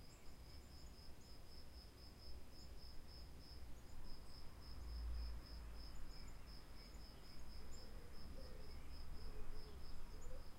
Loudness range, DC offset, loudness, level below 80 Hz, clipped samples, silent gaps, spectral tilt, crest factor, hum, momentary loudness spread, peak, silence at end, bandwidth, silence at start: 4 LU; under 0.1%; -58 LUFS; -54 dBFS; under 0.1%; none; -5 dB/octave; 14 dB; none; 7 LU; -36 dBFS; 0 s; 16 kHz; 0 s